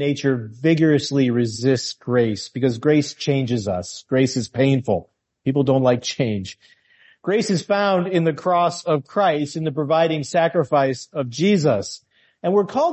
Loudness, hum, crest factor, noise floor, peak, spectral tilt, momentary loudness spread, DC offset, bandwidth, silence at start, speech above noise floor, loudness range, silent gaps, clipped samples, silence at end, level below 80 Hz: -20 LUFS; none; 14 dB; -51 dBFS; -4 dBFS; -6 dB/octave; 7 LU; under 0.1%; 8.6 kHz; 0 s; 32 dB; 2 LU; none; under 0.1%; 0 s; -54 dBFS